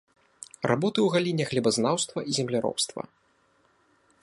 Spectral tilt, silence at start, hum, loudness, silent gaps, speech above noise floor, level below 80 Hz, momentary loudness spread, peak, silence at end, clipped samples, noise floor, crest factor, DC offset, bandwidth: -4.5 dB/octave; 0.6 s; none; -26 LUFS; none; 40 dB; -68 dBFS; 17 LU; -8 dBFS; 1.2 s; under 0.1%; -66 dBFS; 20 dB; under 0.1%; 11.5 kHz